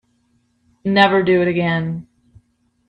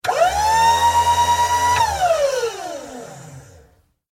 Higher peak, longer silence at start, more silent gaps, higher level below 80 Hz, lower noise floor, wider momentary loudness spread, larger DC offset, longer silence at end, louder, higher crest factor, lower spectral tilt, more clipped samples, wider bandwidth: first, 0 dBFS vs -4 dBFS; first, 0.85 s vs 0.05 s; neither; second, -56 dBFS vs -42 dBFS; first, -63 dBFS vs -54 dBFS; second, 14 LU vs 18 LU; neither; first, 0.85 s vs 0.7 s; about the same, -16 LUFS vs -17 LUFS; about the same, 18 dB vs 14 dB; first, -7.5 dB/octave vs -2 dB/octave; neither; second, 8.2 kHz vs 16.5 kHz